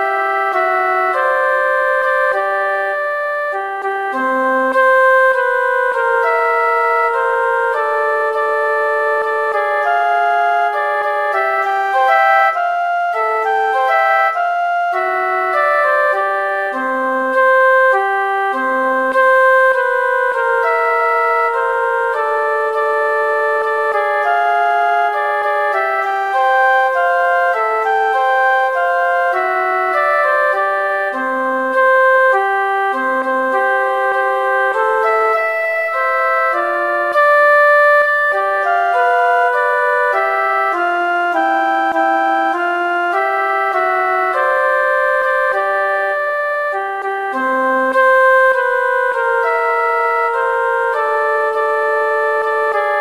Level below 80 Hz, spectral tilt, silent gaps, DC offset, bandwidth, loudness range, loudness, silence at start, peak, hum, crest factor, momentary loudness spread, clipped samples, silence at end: -70 dBFS; -2 dB/octave; none; 0.2%; 15.5 kHz; 3 LU; -14 LUFS; 0 s; -2 dBFS; none; 12 dB; 6 LU; under 0.1%; 0 s